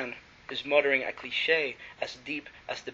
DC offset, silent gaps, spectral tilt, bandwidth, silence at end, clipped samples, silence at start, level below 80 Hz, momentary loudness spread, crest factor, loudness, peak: under 0.1%; none; 0 dB/octave; 7.6 kHz; 0 s; under 0.1%; 0 s; -68 dBFS; 14 LU; 22 dB; -29 LUFS; -8 dBFS